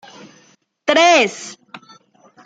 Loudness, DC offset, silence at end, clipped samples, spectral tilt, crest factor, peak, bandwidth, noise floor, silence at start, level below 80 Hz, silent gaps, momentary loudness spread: -14 LUFS; under 0.1%; 0.7 s; under 0.1%; -1.5 dB/octave; 18 dB; -2 dBFS; 9.2 kHz; -54 dBFS; 0.85 s; -68 dBFS; none; 21 LU